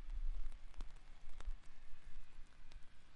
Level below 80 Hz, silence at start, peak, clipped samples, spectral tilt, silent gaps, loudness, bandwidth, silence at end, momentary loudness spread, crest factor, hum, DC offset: -48 dBFS; 0 s; -30 dBFS; under 0.1%; -5 dB/octave; none; -58 LUFS; 5.8 kHz; 0 s; 14 LU; 12 dB; none; under 0.1%